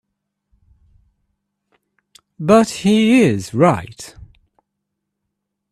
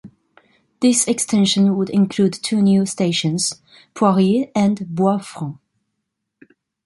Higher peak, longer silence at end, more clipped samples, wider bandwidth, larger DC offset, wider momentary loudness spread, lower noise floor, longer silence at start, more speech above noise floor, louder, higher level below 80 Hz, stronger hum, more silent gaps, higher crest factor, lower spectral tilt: about the same, 0 dBFS vs -2 dBFS; first, 1.65 s vs 1.3 s; neither; first, 13 kHz vs 11.5 kHz; neither; first, 22 LU vs 8 LU; about the same, -77 dBFS vs -77 dBFS; first, 2.4 s vs 0.05 s; first, 63 dB vs 59 dB; about the same, -15 LUFS vs -17 LUFS; first, -52 dBFS vs -62 dBFS; neither; neither; about the same, 20 dB vs 16 dB; about the same, -6 dB/octave vs -5 dB/octave